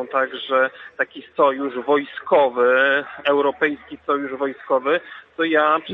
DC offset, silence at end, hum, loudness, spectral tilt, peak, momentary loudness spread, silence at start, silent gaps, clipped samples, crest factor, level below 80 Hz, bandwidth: under 0.1%; 0 s; none; -20 LUFS; -6.5 dB/octave; -2 dBFS; 9 LU; 0 s; none; under 0.1%; 18 dB; -68 dBFS; 4.1 kHz